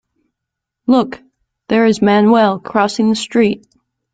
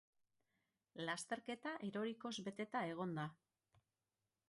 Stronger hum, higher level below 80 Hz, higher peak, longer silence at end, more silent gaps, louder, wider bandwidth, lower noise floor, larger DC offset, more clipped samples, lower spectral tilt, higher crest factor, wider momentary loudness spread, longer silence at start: neither; first, -54 dBFS vs -88 dBFS; first, -2 dBFS vs -30 dBFS; second, 0.55 s vs 1.15 s; neither; first, -14 LUFS vs -46 LUFS; second, 9.2 kHz vs 11.5 kHz; second, -80 dBFS vs under -90 dBFS; neither; neither; about the same, -5.5 dB/octave vs -4.5 dB/octave; second, 14 dB vs 20 dB; first, 14 LU vs 4 LU; about the same, 0.9 s vs 0.95 s